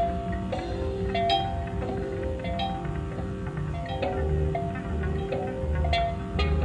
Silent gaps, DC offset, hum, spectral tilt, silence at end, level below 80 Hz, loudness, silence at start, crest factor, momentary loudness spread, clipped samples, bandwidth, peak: none; under 0.1%; none; -7 dB/octave; 0 s; -34 dBFS; -29 LUFS; 0 s; 14 dB; 7 LU; under 0.1%; 10 kHz; -14 dBFS